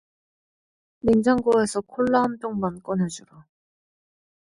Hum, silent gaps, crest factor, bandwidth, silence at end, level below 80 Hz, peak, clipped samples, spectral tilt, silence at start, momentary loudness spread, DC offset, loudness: none; none; 18 dB; 11.5 kHz; 1.2 s; -54 dBFS; -6 dBFS; under 0.1%; -6 dB/octave; 1.05 s; 9 LU; under 0.1%; -23 LUFS